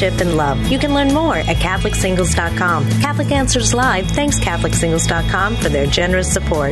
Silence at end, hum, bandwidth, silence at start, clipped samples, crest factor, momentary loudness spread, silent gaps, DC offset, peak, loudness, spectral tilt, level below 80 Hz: 0 s; none; 12.5 kHz; 0 s; under 0.1%; 14 dB; 2 LU; none; under 0.1%; -2 dBFS; -16 LUFS; -4.5 dB/octave; -24 dBFS